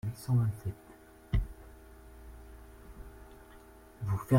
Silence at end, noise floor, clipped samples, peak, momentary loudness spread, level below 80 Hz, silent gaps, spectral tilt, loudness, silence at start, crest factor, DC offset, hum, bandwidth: 0 s; -55 dBFS; under 0.1%; -14 dBFS; 25 LU; -44 dBFS; none; -8 dB/octave; -35 LUFS; 0.05 s; 22 dB; under 0.1%; none; 16.5 kHz